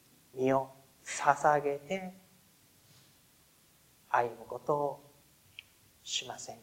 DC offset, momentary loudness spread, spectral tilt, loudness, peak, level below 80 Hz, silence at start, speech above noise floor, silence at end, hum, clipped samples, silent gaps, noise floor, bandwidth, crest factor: under 0.1%; 22 LU; -3.5 dB/octave; -33 LUFS; -10 dBFS; -76 dBFS; 0.35 s; 33 dB; 0.05 s; none; under 0.1%; none; -65 dBFS; 16 kHz; 26 dB